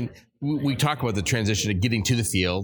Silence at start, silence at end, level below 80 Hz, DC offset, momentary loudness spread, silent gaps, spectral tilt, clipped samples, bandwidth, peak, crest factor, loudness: 0 s; 0 s; -46 dBFS; under 0.1%; 6 LU; none; -4.5 dB/octave; under 0.1%; 19.5 kHz; -8 dBFS; 16 dB; -24 LUFS